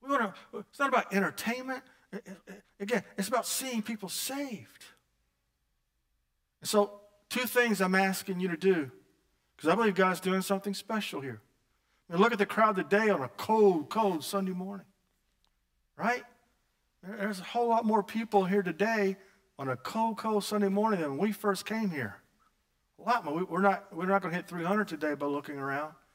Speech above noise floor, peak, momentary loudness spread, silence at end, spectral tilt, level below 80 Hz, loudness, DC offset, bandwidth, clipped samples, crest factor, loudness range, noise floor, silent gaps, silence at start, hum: 48 dB; -10 dBFS; 14 LU; 0.2 s; -5 dB/octave; -78 dBFS; -30 LUFS; under 0.1%; 16 kHz; under 0.1%; 22 dB; 7 LU; -78 dBFS; none; 0.05 s; none